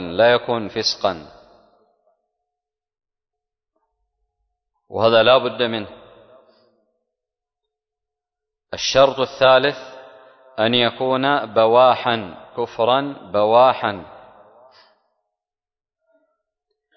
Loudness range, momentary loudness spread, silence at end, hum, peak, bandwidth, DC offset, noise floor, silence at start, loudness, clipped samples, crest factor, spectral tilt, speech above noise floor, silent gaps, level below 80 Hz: 11 LU; 18 LU; 2.9 s; none; -2 dBFS; 6.4 kHz; under 0.1%; -90 dBFS; 0 s; -17 LUFS; under 0.1%; 20 dB; -4 dB/octave; 73 dB; none; -58 dBFS